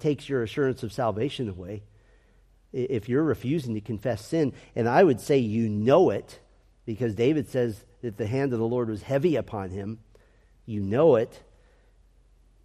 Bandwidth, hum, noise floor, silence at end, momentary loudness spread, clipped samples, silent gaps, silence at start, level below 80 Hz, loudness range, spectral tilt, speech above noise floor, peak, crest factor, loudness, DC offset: 14 kHz; none; -59 dBFS; 1.25 s; 16 LU; under 0.1%; none; 0 s; -58 dBFS; 6 LU; -7.5 dB/octave; 34 dB; -6 dBFS; 20 dB; -26 LUFS; under 0.1%